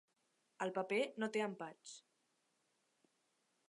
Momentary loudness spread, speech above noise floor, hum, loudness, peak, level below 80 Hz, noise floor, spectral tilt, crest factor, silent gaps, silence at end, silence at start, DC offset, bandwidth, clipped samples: 17 LU; 41 dB; none; -41 LUFS; -26 dBFS; under -90 dBFS; -82 dBFS; -4.5 dB/octave; 20 dB; none; 1.7 s; 0.6 s; under 0.1%; 11.5 kHz; under 0.1%